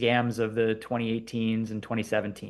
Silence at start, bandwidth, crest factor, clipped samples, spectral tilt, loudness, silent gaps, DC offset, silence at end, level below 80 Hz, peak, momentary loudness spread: 0 s; 12.5 kHz; 18 dB; under 0.1%; -6 dB/octave; -29 LUFS; none; under 0.1%; 0 s; -62 dBFS; -10 dBFS; 5 LU